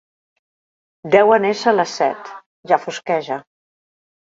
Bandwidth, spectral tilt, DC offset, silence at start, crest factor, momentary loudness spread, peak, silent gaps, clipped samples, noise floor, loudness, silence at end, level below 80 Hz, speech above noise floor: 7.8 kHz; -4.5 dB/octave; under 0.1%; 1.05 s; 20 dB; 21 LU; 0 dBFS; 2.46-2.63 s; under 0.1%; under -90 dBFS; -17 LUFS; 0.9 s; -66 dBFS; over 73 dB